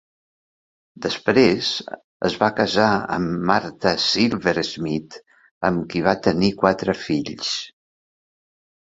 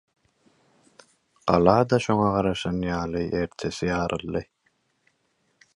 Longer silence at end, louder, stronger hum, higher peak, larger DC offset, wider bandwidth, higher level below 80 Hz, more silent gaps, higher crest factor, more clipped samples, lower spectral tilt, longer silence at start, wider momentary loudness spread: second, 1.15 s vs 1.3 s; first, -21 LUFS vs -24 LUFS; neither; about the same, -2 dBFS vs -2 dBFS; neither; second, 8 kHz vs 11.5 kHz; about the same, -52 dBFS vs -48 dBFS; first, 2.04-2.20 s, 5.51-5.61 s vs none; about the same, 20 dB vs 24 dB; neither; second, -5 dB/octave vs -6.5 dB/octave; second, 1 s vs 1.45 s; about the same, 9 LU vs 11 LU